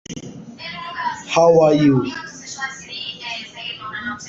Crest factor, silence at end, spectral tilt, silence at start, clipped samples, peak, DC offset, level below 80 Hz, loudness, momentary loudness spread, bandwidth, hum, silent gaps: 16 dB; 0 s; -5.5 dB/octave; 0.1 s; under 0.1%; -4 dBFS; under 0.1%; -54 dBFS; -19 LUFS; 19 LU; 7.8 kHz; none; none